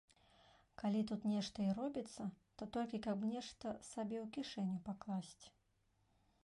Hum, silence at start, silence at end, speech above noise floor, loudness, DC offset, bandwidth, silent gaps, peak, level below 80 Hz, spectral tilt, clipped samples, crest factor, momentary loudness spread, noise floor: none; 0.8 s; 0.95 s; 36 dB; -44 LUFS; under 0.1%; 11.5 kHz; none; -30 dBFS; -74 dBFS; -6 dB/octave; under 0.1%; 14 dB; 10 LU; -79 dBFS